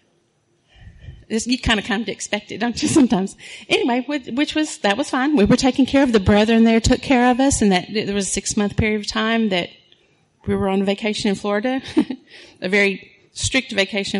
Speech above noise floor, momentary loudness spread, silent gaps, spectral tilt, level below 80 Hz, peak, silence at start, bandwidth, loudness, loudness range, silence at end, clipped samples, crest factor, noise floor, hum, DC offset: 45 dB; 10 LU; none; -4.5 dB/octave; -38 dBFS; -4 dBFS; 0.8 s; 11.5 kHz; -19 LUFS; 5 LU; 0 s; under 0.1%; 16 dB; -63 dBFS; none; under 0.1%